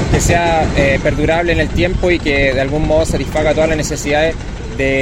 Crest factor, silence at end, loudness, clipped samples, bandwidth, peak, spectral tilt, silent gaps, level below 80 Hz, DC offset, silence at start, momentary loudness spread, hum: 14 dB; 0 s; -14 LUFS; under 0.1%; 16 kHz; 0 dBFS; -5 dB/octave; none; -22 dBFS; under 0.1%; 0 s; 4 LU; none